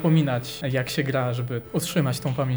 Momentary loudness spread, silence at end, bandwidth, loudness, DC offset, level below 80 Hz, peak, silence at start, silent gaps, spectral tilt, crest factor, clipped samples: 6 LU; 0 s; over 20 kHz; -25 LUFS; 0.1%; -58 dBFS; -10 dBFS; 0 s; none; -6 dB/octave; 14 dB; under 0.1%